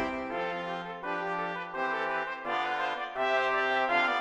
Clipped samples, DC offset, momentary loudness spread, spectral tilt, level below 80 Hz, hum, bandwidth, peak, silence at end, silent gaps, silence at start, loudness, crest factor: under 0.1%; under 0.1%; 8 LU; -4.5 dB/octave; -64 dBFS; none; 10 kHz; -14 dBFS; 0 s; none; 0 s; -31 LUFS; 16 dB